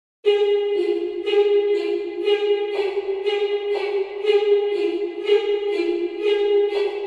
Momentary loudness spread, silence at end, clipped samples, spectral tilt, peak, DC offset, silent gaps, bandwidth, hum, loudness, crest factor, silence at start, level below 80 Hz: 6 LU; 0 s; under 0.1%; -3.5 dB/octave; -6 dBFS; under 0.1%; none; 7.4 kHz; none; -21 LUFS; 14 dB; 0.25 s; -66 dBFS